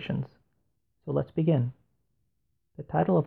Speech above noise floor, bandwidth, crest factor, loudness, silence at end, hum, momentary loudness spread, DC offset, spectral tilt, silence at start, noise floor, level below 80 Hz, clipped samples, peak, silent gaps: 52 dB; 4.4 kHz; 18 dB; -29 LUFS; 0 s; none; 17 LU; under 0.1%; -11.5 dB/octave; 0 s; -79 dBFS; -60 dBFS; under 0.1%; -12 dBFS; none